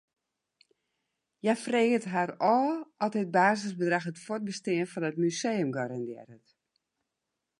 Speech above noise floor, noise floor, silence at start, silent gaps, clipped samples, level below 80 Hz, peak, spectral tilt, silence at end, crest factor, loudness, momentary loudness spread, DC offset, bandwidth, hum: 57 dB; -86 dBFS; 1.45 s; none; under 0.1%; -82 dBFS; -10 dBFS; -5.5 dB/octave; 1.25 s; 20 dB; -29 LUFS; 10 LU; under 0.1%; 11.5 kHz; none